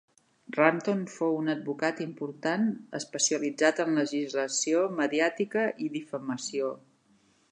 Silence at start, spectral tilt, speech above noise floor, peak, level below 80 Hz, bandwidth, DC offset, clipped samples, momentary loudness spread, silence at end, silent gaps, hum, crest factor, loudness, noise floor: 0.5 s; -3.5 dB/octave; 37 dB; -4 dBFS; -82 dBFS; 10.5 kHz; under 0.1%; under 0.1%; 10 LU; 0.7 s; none; none; 24 dB; -29 LUFS; -65 dBFS